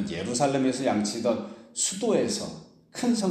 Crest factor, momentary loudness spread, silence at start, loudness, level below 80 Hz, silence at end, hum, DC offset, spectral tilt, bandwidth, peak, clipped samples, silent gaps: 16 dB; 12 LU; 0 s; -27 LUFS; -64 dBFS; 0 s; none; under 0.1%; -4 dB/octave; 15 kHz; -10 dBFS; under 0.1%; none